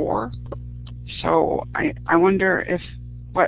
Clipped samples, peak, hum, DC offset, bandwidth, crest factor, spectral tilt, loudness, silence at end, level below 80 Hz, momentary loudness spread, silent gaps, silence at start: under 0.1%; -2 dBFS; 60 Hz at -40 dBFS; under 0.1%; 4 kHz; 20 dB; -10.5 dB/octave; -21 LUFS; 0 s; -40 dBFS; 19 LU; none; 0 s